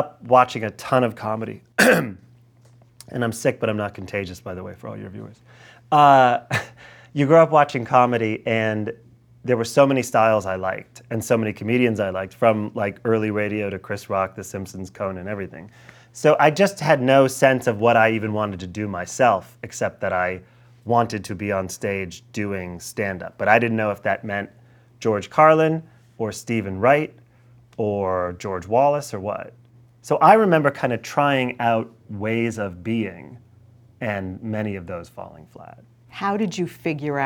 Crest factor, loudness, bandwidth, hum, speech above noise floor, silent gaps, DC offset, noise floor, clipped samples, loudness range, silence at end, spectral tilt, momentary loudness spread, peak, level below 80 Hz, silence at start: 20 dB; -21 LUFS; over 20 kHz; none; 32 dB; none; under 0.1%; -52 dBFS; under 0.1%; 9 LU; 0 s; -5.5 dB/octave; 17 LU; 0 dBFS; -60 dBFS; 0 s